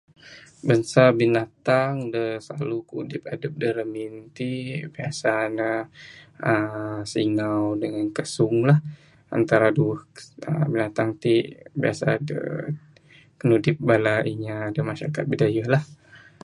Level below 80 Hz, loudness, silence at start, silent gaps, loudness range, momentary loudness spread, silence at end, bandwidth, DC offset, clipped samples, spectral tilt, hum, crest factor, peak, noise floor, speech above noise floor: -62 dBFS; -24 LUFS; 0.25 s; none; 5 LU; 13 LU; 0.25 s; 11.5 kHz; under 0.1%; under 0.1%; -7 dB/octave; none; 22 dB; -2 dBFS; -53 dBFS; 30 dB